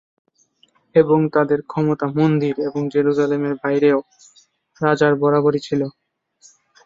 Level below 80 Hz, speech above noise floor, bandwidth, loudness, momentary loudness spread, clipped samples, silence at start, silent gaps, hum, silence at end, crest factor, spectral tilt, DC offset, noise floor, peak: -60 dBFS; 42 dB; 7.6 kHz; -18 LUFS; 7 LU; under 0.1%; 0.95 s; none; none; 0.95 s; 18 dB; -8 dB/octave; under 0.1%; -60 dBFS; -2 dBFS